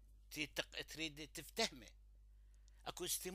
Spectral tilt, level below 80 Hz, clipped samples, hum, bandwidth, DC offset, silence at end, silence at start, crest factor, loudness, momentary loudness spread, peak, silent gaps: -1.5 dB/octave; -64 dBFS; under 0.1%; 50 Hz at -65 dBFS; 15.5 kHz; under 0.1%; 0 s; 0 s; 26 dB; -45 LUFS; 12 LU; -22 dBFS; none